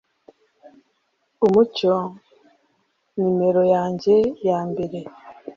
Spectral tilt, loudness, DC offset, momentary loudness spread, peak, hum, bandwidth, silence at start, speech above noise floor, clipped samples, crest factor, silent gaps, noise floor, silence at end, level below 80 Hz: -8 dB/octave; -20 LUFS; under 0.1%; 16 LU; -4 dBFS; none; 7.2 kHz; 1.4 s; 50 dB; under 0.1%; 18 dB; none; -69 dBFS; 0.05 s; -62 dBFS